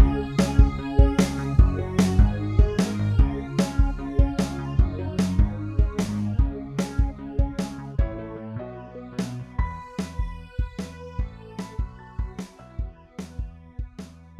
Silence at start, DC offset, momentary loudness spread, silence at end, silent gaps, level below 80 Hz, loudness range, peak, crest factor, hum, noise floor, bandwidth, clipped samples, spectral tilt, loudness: 0 s; under 0.1%; 16 LU; 0.1 s; none; -26 dBFS; 13 LU; -2 dBFS; 20 dB; none; -42 dBFS; 12 kHz; under 0.1%; -7 dB/octave; -25 LUFS